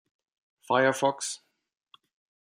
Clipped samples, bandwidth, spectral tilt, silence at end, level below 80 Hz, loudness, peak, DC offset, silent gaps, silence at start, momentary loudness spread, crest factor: under 0.1%; 16 kHz; -3.5 dB/octave; 1.15 s; -78 dBFS; -27 LUFS; -10 dBFS; under 0.1%; none; 0.7 s; 12 LU; 22 dB